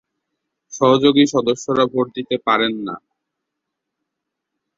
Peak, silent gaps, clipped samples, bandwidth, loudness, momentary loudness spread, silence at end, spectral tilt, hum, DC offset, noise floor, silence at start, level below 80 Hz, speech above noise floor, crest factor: -2 dBFS; none; under 0.1%; 7.8 kHz; -17 LUFS; 16 LU; 1.8 s; -4.5 dB/octave; none; under 0.1%; -80 dBFS; 0.7 s; -60 dBFS; 63 dB; 18 dB